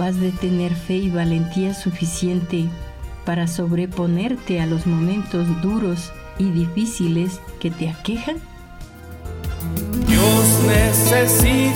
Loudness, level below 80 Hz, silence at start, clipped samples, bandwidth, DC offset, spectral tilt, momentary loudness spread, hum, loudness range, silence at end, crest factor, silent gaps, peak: -19 LUFS; -32 dBFS; 0 s; under 0.1%; 17.5 kHz; under 0.1%; -5 dB/octave; 16 LU; none; 6 LU; 0 s; 16 dB; none; -2 dBFS